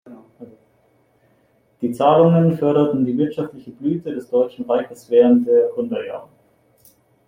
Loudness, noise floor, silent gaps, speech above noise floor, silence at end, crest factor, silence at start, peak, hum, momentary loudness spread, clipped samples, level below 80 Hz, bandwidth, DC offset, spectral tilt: -18 LUFS; -60 dBFS; none; 42 dB; 1.05 s; 18 dB; 0.1 s; -2 dBFS; none; 14 LU; under 0.1%; -64 dBFS; 14.5 kHz; under 0.1%; -9 dB/octave